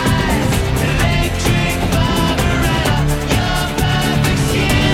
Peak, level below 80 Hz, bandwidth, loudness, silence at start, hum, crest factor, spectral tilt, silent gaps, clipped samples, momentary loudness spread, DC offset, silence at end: 0 dBFS; -22 dBFS; 16.5 kHz; -15 LUFS; 0 s; none; 14 dB; -5 dB/octave; none; under 0.1%; 2 LU; under 0.1%; 0 s